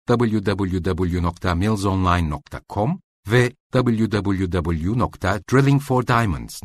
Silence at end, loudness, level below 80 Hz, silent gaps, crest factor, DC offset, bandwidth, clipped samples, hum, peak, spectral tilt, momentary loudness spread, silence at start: 0.05 s; -21 LUFS; -38 dBFS; 3.04-3.23 s, 3.60-3.70 s; 16 dB; under 0.1%; 13.5 kHz; under 0.1%; none; -4 dBFS; -7 dB/octave; 6 LU; 0.1 s